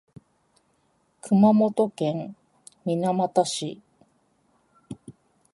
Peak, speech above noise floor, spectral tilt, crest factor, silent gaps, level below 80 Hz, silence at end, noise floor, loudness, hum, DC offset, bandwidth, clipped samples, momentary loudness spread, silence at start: -8 dBFS; 45 dB; -6.5 dB/octave; 20 dB; none; -70 dBFS; 0.4 s; -68 dBFS; -23 LUFS; none; under 0.1%; 11.5 kHz; under 0.1%; 24 LU; 1.25 s